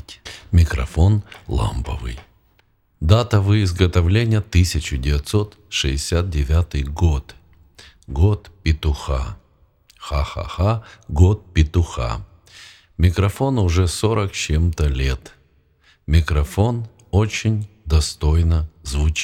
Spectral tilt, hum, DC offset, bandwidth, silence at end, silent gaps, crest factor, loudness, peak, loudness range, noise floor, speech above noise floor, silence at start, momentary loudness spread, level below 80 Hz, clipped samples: -6 dB/octave; none; under 0.1%; 13.5 kHz; 0 s; none; 20 dB; -20 LUFS; 0 dBFS; 4 LU; -60 dBFS; 42 dB; 0.1 s; 10 LU; -26 dBFS; under 0.1%